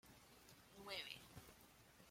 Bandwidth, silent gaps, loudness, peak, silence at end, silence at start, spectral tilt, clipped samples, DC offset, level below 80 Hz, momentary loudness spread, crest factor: 16.5 kHz; none; -56 LUFS; -36 dBFS; 0 s; 0.05 s; -2.5 dB/octave; under 0.1%; under 0.1%; -78 dBFS; 16 LU; 24 dB